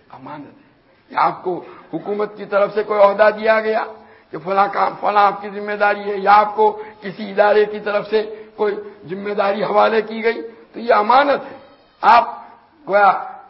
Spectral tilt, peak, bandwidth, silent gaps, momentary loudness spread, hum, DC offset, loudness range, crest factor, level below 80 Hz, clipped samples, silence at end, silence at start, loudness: -7 dB/octave; 0 dBFS; 5.8 kHz; none; 17 LU; none; under 0.1%; 3 LU; 18 dB; -62 dBFS; under 0.1%; 0.1 s; 0.15 s; -17 LUFS